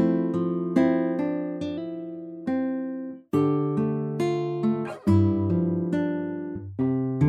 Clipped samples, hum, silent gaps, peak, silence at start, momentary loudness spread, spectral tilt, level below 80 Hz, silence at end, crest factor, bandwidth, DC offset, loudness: under 0.1%; none; none; -8 dBFS; 0 s; 11 LU; -9.5 dB/octave; -62 dBFS; 0 s; 18 dB; 10.5 kHz; under 0.1%; -26 LUFS